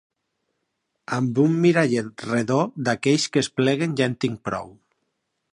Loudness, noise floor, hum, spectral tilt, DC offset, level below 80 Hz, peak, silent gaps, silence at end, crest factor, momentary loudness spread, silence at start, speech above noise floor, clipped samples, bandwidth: -22 LUFS; -76 dBFS; none; -5.5 dB/octave; under 0.1%; -62 dBFS; -4 dBFS; none; 0.8 s; 18 dB; 9 LU; 1.1 s; 55 dB; under 0.1%; 11 kHz